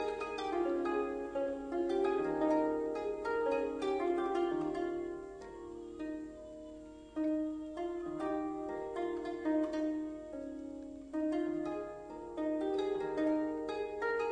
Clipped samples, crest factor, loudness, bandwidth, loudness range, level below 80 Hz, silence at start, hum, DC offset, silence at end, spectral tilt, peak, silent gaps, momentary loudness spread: under 0.1%; 16 dB; -37 LUFS; 9.8 kHz; 6 LU; -64 dBFS; 0 s; none; under 0.1%; 0 s; -6 dB/octave; -20 dBFS; none; 12 LU